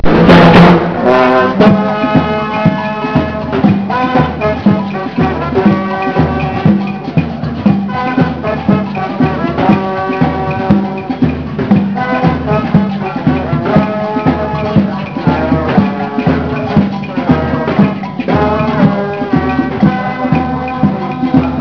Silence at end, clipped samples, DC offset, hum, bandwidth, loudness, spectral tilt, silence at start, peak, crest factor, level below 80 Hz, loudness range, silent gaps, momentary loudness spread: 0 s; 0.7%; under 0.1%; none; 5.4 kHz; -12 LUFS; -9 dB/octave; 0 s; 0 dBFS; 12 dB; -30 dBFS; 2 LU; none; 7 LU